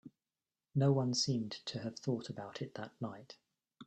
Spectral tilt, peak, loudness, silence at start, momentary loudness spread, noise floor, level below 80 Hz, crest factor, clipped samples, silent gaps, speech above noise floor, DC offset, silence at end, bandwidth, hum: -5.5 dB/octave; -18 dBFS; -37 LUFS; 0.05 s; 14 LU; under -90 dBFS; -76 dBFS; 20 dB; under 0.1%; none; over 53 dB; under 0.1%; 0 s; 8.8 kHz; none